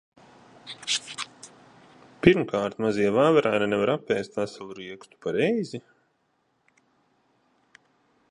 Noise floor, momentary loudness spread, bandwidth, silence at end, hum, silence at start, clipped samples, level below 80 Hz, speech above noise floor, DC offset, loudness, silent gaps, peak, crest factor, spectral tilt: -71 dBFS; 21 LU; 11 kHz; 2.5 s; none; 0.65 s; under 0.1%; -56 dBFS; 47 dB; under 0.1%; -25 LUFS; none; 0 dBFS; 26 dB; -5 dB/octave